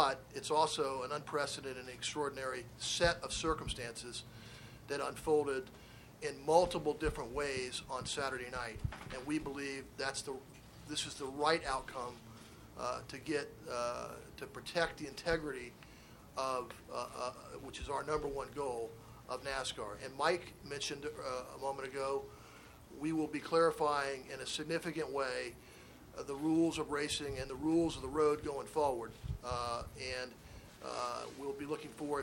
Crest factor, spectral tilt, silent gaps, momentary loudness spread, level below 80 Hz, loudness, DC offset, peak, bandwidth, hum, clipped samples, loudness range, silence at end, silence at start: 24 dB; -4 dB/octave; none; 16 LU; -58 dBFS; -38 LUFS; under 0.1%; -14 dBFS; 17.5 kHz; none; under 0.1%; 5 LU; 0 s; 0 s